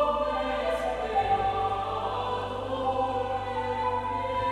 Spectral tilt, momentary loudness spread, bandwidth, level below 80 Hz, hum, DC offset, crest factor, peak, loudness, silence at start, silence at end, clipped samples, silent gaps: -5.5 dB/octave; 4 LU; 12.5 kHz; -46 dBFS; none; under 0.1%; 14 dB; -14 dBFS; -29 LUFS; 0 s; 0 s; under 0.1%; none